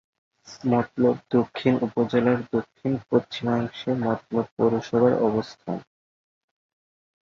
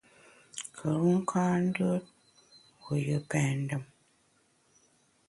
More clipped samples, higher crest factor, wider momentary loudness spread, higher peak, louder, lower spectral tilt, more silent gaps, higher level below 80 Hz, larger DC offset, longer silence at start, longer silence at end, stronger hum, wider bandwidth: neither; about the same, 18 dB vs 18 dB; second, 8 LU vs 14 LU; first, -6 dBFS vs -16 dBFS; first, -24 LUFS vs -31 LUFS; about the same, -7.5 dB/octave vs -6.5 dB/octave; first, 4.52-4.57 s vs none; first, -60 dBFS vs -68 dBFS; neither; about the same, 0.5 s vs 0.55 s; about the same, 1.4 s vs 1.45 s; neither; second, 7.2 kHz vs 11.5 kHz